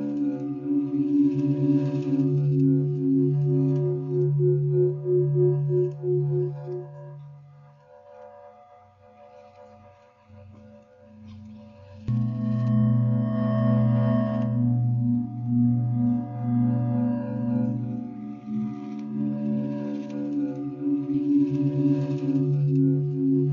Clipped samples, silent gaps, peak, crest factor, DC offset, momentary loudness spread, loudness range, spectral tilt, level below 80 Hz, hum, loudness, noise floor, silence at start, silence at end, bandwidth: under 0.1%; none; -12 dBFS; 12 dB; under 0.1%; 10 LU; 7 LU; -11.5 dB/octave; -60 dBFS; none; -25 LUFS; -53 dBFS; 0 s; 0 s; 4.4 kHz